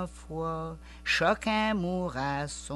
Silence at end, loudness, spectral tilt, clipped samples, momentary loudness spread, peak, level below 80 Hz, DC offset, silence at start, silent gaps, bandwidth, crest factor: 0 s; -30 LUFS; -4.5 dB/octave; under 0.1%; 11 LU; -12 dBFS; -48 dBFS; under 0.1%; 0 s; none; 12.5 kHz; 18 dB